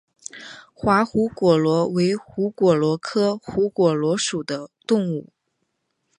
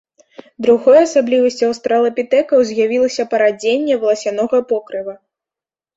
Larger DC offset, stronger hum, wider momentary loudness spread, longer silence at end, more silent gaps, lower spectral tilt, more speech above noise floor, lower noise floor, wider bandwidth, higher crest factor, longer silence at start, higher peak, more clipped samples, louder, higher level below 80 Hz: neither; neither; first, 13 LU vs 9 LU; first, 0.95 s vs 0.8 s; neither; first, -5.5 dB/octave vs -4 dB/octave; second, 54 dB vs 75 dB; second, -74 dBFS vs -89 dBFS; first, 11 kHz vs 8 kHz; about the same, 18 dB vs 14 dB; second, 0.35 s vs 0.6 s; about the same, -4 dBFS vs -2 dBFS; neither; second, -21 LUFS vs -15 LUFS; first, -56 dBFS vs -62 dBFS